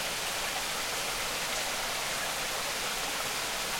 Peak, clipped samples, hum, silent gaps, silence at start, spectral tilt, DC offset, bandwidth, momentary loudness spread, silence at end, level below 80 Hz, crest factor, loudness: -18 dBFS; under 0.1%; none; none; 0 s; 0 dB/octave; under 0.1%; 16.5 kHz; 1 LU; 0 s; -54 dBFS; 14 dB; -31 LUFS